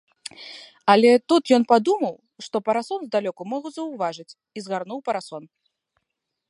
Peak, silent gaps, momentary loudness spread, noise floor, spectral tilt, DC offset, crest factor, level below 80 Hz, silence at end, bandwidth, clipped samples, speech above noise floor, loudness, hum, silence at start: -2 dBFS; none; 23 LU; -81 dBFS; -5 dB/octave; under 0.1%; 22 dB; -76 dBFS; 1.05 s; 11.5 kHz; under 0.1%; 59 dB; -22 LUFS; none; 0.4 s